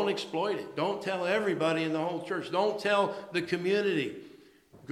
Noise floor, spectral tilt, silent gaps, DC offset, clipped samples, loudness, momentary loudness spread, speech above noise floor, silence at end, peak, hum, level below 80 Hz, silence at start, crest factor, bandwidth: -56 dBFS; -5.5 dB/octave; none; under 0.1%; under 0.1%; -30 LUFS; 5 LU; 26 dB; 0 s; -12 dBFS; none; -76 dBFS; 0 s; 18 dB; 13.5 kHz